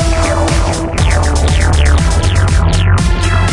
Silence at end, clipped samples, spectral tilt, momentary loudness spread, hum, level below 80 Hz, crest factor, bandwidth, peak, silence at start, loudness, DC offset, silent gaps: 0 s; under 0.1%; -5 dB/octave; 2 LU; none; -14 dBFS; 10 dB; 11.5 kHz; 0 dBFS; 0 s; -12 LUFS; under 0.1%; none